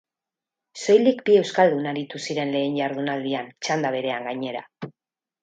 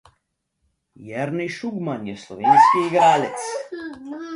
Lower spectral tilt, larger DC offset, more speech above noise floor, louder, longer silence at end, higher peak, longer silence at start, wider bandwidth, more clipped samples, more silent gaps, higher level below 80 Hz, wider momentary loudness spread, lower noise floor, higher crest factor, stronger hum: about the same, -5 dB/octave vs -5 dB/octave; neither; first, 66 dB vs 54 dB; second, -23 LUFS vs -19 LUFS; first, 0.5 s vs 0 s; about the same, -4 dBFS vs -2 dBFS; second, 0.75 s vs 1 s; second, 9 kHz vs 11.5 kHz; neither; neither; second, -74 dBFS vs -66 dBFS; second, 15 LU vs 20 LU; first, -89 dBFS vs -74 dBFS; about the same, 20 dB vs 18 dB; neither